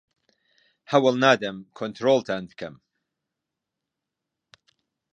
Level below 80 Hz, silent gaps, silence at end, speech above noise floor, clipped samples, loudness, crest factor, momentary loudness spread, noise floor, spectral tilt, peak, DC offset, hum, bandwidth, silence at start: -70 dBFS; none; 2.4 s; 62 dB; under 0.1%; -23 LUFS; 24 dB; 19 LU; -85 dBFS; -5 dB/octave; -4 dBFS; under 0.1%; none; 8.4 kHz; 0.9 s